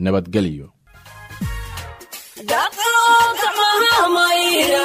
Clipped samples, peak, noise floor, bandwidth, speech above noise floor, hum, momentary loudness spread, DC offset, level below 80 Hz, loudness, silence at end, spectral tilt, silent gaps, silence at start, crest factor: under 0.1%; -4 dBFS; -42 dBFS; 16 kHz; 25 dB; none; 20 LU; under 0.1%; -40 dBFS; -15 LUFS; 0 s; -3 dB/octave; none; 0 s; 14 dB